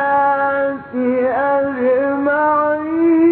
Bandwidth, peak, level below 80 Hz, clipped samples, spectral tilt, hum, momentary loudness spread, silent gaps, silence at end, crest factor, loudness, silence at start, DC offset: 4.3 kHz; -6 dBFS; -56 dBFS; under 0.1%; -10.5 dB/octave; none; 4 LU; none; 0 s; 10 dB; -16 LUFS; 0 s; under 0.1%